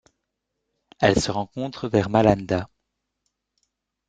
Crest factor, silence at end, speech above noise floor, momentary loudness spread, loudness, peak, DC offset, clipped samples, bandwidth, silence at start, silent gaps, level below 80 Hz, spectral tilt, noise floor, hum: 24 dB; 1.45 s; 58 dB; 11 LU; -22 LUFS; -2 dBFS; under 0.1%; under 0.1%; 9.4 kHz; 1 s; none; -48 dBFS; -5.5 dB/octave; -80 dBFS; none